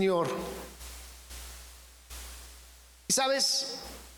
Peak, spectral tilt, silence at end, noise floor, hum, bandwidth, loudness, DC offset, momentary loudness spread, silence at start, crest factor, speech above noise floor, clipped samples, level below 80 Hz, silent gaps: -16 dBFS; -2 dB/octave; 0 s; -54 dBFS; none; 19.5 kHz; -29 LUFS; under 0.1%; 22 LU; 0 s; 18 dB; 25 dB; under 0.1%; -52 dBFS; none